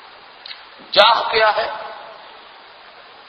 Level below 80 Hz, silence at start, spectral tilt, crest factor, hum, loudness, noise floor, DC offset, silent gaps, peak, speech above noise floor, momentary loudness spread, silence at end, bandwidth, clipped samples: -60 dBFS; 0.5 s; -2.5 dB/octave; 20 dB; none; -15 LUFS; -43 dBFS; under 0.1%; none; 0 dBFS; 27 dB; 25 LU; 1 s; 11 kHz; under 0.1%